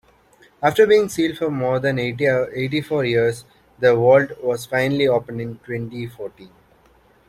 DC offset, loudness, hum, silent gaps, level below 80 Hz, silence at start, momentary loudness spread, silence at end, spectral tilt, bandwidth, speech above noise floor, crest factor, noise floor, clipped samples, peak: under 0.1%; -19 LUFS; none; none; -56 dBFS; 0.6 s; 16 LU; 0.85 s; -6 dB/octave; 15.5 kHz; 36 dB; 18 dB; -55 dBFS; under 0.1%; -2 dBFS